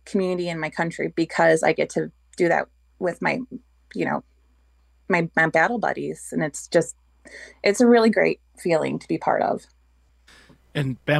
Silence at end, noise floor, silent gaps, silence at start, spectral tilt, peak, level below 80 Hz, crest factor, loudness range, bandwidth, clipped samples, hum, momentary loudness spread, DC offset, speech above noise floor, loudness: 0 s; -59 dBFS; none; 0.05 s; -5.5 dB/octave; -4 dBFS; -58 dBFS; 18 dB; 4 LU; 12.5 kHz; under 0.1%; none; 13 LU; under 0.1%; 37 dB; -23 LUFS